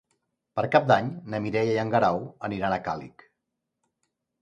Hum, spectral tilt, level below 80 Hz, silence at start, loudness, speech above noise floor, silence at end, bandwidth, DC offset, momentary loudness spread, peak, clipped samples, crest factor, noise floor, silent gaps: none; -7 dB/octave; -60 dBFS; 0.55 s; -26 LUFS; 57 dB; 1.35 s; 9.6 kHz; under 0.1%; 12 LU; -4 dBFS; under 0.1%; 22 dB; -82 dBFS; none